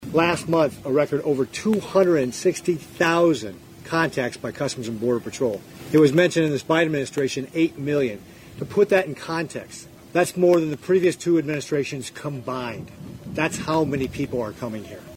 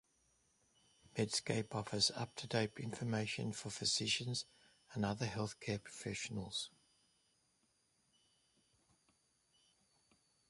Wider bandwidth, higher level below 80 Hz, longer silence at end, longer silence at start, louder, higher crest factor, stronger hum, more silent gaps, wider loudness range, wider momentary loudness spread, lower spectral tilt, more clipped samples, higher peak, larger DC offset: first, 16.5 kHz vs 11.5 kHz; first, -56 dBFS vs -72 dBFS; second, 0 s vs 3.8 s; second, 0 s vs 1.15 s; first, -22 LUFS vs -40 LUFS; second, 18 dB vs 24 dB; neither; neither; second, 3 LU vs 10 LU; first, 14 LU vs 9 LU; first, -5.5 dB/octave vs -3.5 dB/octave; neither; first, -4 dBFS vs -20 dBFS; neither